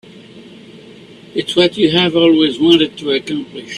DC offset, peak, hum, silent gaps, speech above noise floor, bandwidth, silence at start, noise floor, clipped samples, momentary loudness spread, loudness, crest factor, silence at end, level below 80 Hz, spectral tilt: under 0.1%; 0 dBFS; none; none; 25 dB; 11 kHz; 0.15 s; -38 dBFS; under 0.1%; 12 LU; -13 LUFS; 16 dB; 0 s; -54 dBFS; -5.5 dB/octave